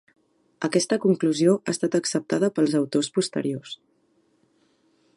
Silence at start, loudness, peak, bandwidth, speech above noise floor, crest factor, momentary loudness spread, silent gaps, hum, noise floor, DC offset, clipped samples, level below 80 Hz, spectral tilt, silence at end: 0.6 s; -24 LUFS; -8 dBFS; 11.5 kHz; 43 dB; 18 dB; 10 LU; none; none; -66 dBFS; under 0.1%; under 0.1%; -74 dBFS; -5 dB/octave; 1.4 s